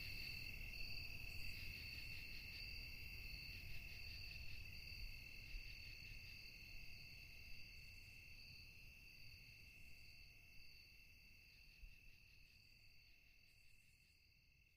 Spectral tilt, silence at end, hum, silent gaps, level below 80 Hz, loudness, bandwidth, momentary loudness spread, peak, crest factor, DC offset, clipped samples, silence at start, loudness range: -3 dB/octave; 0 s; none; none; -62 dBFS; -55 LUFS; 15.5 kHz; 16 LU; -38 dBFS; 18 dB; under 0.1%; under 0.1%; 0 s; 14 LU